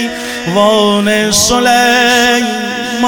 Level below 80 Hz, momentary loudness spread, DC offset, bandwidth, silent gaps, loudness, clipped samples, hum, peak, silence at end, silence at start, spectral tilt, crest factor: -38 dBFS; 9 LU; under 0.1%; 19.5 kHz; none; -10 LUFS; under 0.1%; none; 0 dBFS; 0 s; 0 s; -2.5 dB/octave; 10 dB